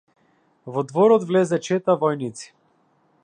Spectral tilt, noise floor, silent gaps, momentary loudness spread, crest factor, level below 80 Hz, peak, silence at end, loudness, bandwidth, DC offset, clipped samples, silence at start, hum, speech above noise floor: -6.5 dB/octave; -63 dBFS; none; 14 LU; 18 dB; -74 dBFS; -6 dBFS; 0.8 s; -21 LUFS; 10 kHz; under 0.1%; under 0.1%; 0.65 s; none; 43 dB